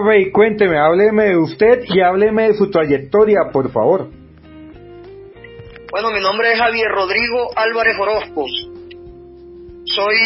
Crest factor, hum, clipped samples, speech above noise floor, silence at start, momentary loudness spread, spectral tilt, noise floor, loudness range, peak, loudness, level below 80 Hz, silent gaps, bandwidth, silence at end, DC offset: 16 dB; none; under 0.1%; 25 dB; 0 s; 10 LU; -9 dB/octave; -39 dBFS; 6 LU; 0 dBFS; -14 LUFS; -46 dBFS; none; 5.8 kHz; 0 s; under 0.1%